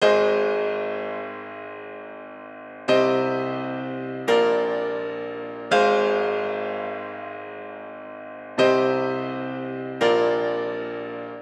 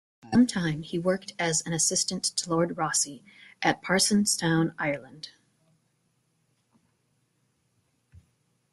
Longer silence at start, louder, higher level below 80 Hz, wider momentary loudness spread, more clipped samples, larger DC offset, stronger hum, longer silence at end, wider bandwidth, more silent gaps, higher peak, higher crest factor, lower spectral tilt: second, 0 s vs 0.25 s; about the same, -24 LUFS vs -26 LUFS; second, -72 dBFS vs -64 dBFS; first, 18 LU vs 9 LU; neither; neither; neither; second, 0 s vs 3.45 s; second, 10.5 kHz vs 12.5 kHz; neither; about the same, -6 dBFS vs -8 dBFS; about the same, 18 dB vs 22 dB; first, -5 dB/octave vs -3.5 dB/octave